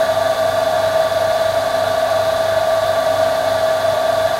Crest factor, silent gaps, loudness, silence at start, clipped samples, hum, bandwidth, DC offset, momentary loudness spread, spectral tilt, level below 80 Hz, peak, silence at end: 12 dB; none; -16 LUFS; 0 s; under 0.1%; none; 16 kHz; under 0.1%; 1 LU; -3 dB/octave; -48 dBFS; -4 dBFS; 0 s